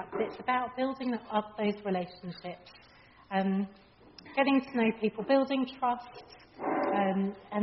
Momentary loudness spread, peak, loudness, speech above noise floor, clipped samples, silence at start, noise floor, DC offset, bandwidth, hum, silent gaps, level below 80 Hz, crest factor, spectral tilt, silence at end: 14 LU; -14 dBFS; -31 LUFS; 22 dB; under 0.1%; 0 s; -53 dBFS; under 0.1%; 5.8 kHz; none; none; -70 dBFS; 18 dB; -4.5 dB/octave; 0 s